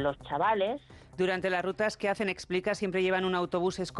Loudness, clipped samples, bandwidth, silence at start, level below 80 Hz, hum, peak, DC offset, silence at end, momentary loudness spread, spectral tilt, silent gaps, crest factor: -30 LUFS; under 0.1%; 11.5 kHz; 0 s; -60 dBFS; none; -18 dBFS; under 0.1%; 0 s; 5 LU; -5 dB/octave; none; 12 dB